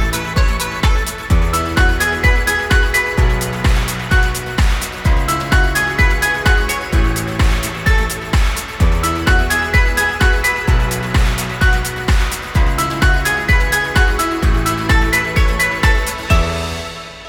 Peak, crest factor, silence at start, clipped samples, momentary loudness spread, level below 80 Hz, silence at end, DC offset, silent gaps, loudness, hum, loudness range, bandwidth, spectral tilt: 0 dBFS; 14 dB; 0 s; under 0.1%; 4 LU; -16 dBFS; 0 s; under 0.1%; none; -16 LUFS; none; 1 LU; 17.5 kHz; -4.5 dB/octave